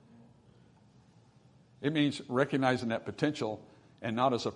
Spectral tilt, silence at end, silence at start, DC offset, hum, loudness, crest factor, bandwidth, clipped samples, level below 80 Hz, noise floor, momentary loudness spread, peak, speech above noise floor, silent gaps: -6 dB/octave; 0 s; 1.8 s; under 0.1%; none; -32 LUFS; 22 dB; 10.5 kHz; under 0.1%; -74 dBFS; -62 dBFS; 9 LU; -12 dBFS; 31 dB; none